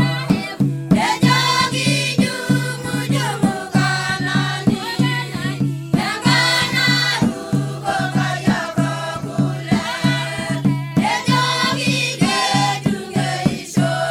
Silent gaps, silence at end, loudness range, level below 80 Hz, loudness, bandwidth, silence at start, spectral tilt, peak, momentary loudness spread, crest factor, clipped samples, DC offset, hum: none; 0 s; 2 LU; -48 dBFS; -18 LUFS; 16.5 kHz; 0 s; -4.5 dB/octave; -2 dBFS; 7 LU; 18 dB; under 0.1%; under 0.1%; none